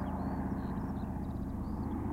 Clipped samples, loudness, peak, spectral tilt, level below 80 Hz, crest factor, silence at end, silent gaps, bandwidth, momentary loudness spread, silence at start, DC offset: under 0.1%; -38 LUFS; -24 dBFS; -9.5 dB/octave; -44 dBFS; 12 dB; 0 s; none; 16 kHz; 2 LU; 0 s; under 0.1%